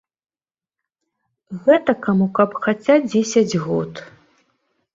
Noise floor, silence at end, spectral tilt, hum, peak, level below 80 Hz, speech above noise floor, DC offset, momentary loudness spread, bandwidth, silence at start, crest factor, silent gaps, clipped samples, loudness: under -90 dBFS; 0.9 s; -6 dB/octave; none; -2 dBFS; -60 dBFS; over 73 dB; under 0.1%; 10 LU; 7.8 kHz; 1.5 s; 18 dB; none; under 0.1%; -18 LUFS